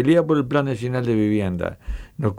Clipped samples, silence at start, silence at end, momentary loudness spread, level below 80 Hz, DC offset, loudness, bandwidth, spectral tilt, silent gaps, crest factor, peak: under 0.1%; 0 s; 0 s; 12 LU; -38 dBFS; under 0.1%; -21 LUFS; 11.5 kHz; -8 dB/octave; none; 14 dB; -6 dBFS